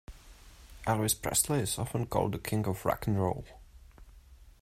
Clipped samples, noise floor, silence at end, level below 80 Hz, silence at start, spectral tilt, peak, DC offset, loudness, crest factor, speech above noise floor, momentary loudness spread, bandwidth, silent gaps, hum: under 0.1%; -55 dBFS; 0.15 s; -52 dBFS; 0.1 s; -4.5 dB/octave; -12 dBFS; under 0.1%; -31 LUFS; 20 dB; 24 dB; 7 LU; 16 kHz; none; none